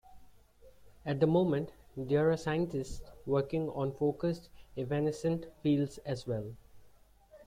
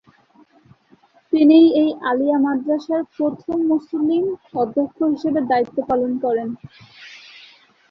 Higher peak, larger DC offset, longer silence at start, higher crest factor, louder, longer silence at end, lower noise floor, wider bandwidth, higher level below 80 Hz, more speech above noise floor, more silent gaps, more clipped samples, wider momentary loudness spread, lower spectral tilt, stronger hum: second, -16 dBFS vs -4 dBFS; neither; second, 0.1 s vs 1.3 s; about the same, 18 dB vs 16 dB; second, -33 LUFS vs -19 LUFS; second, 0.05 s vs 0.7 s; first, -61 dBFS vs -55 dBFS; first, 15.5 kHz vs 6 kHz; about the same, -58 dBFS vs -62 dBFS; second, 29 dB vs 37 dB; neither; neither; first, 15 LU vs 12 LU; about the same, -7.5 dB/octave vs -7.5 dB/octave; neither